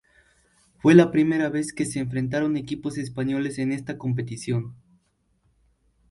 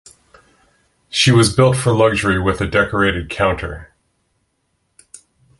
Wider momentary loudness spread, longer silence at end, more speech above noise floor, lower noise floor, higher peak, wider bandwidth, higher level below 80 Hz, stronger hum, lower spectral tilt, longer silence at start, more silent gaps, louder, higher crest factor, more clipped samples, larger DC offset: about the same, 13 LU vs 11 LU; second, 1.35 s vs 1.75 s; second, 45 dB vs 52 dB; about the same, -68 dBFS vs -67 dBFS; about the same, -2 dBFS vs -2 dBFS; about the same, 11.5 kHz vs 12 kHz; second, -58 dBFS vs -36 dBFS; neither; first, -6.5 dB/octave vs -5 dB/octave; second, 0.85 s vs 1.1 s; neither; second, -24 LUFS vs -15 LUFS; first, 22 dB vs 16 dB; neither; neither